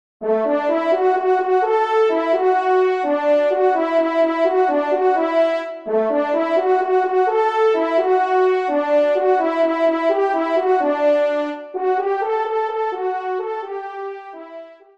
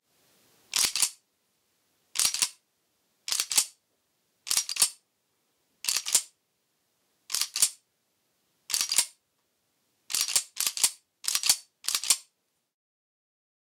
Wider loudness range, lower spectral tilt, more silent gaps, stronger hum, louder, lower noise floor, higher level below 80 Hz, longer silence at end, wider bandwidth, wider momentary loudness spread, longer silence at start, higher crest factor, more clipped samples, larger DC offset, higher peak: about the same, 3 LU vs 3 LU; first, -5 dB/octave vs 3.5 dB/octave; neither; neither; first, -18 LUFS vs -26 LUFS; second, -38 dBFS vs -76 dBFS; about the same, -74 dBFS vs -76 dBFS; second, 0.25 s vs 1.5 s; second, 7.4 kHz vs 18 kHz; about the same, 8 LU vs 9 LU; second, 0.2 s vs 0.7 s; second, 12 dB vs 26 dB; neither; first, 0.1% vs under 0.1%; about the same, -6 dBFS vs -8 dBFS